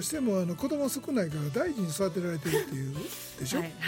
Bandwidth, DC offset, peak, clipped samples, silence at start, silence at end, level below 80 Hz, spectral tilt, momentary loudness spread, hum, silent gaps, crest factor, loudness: 17 kHz; under 0.1%; -16 dBFS; under 0.1%; 0 s; 0 s; -60 dBFS; -5 dB/octave; 7 LU; none; none; 16 dB; -31 LUFS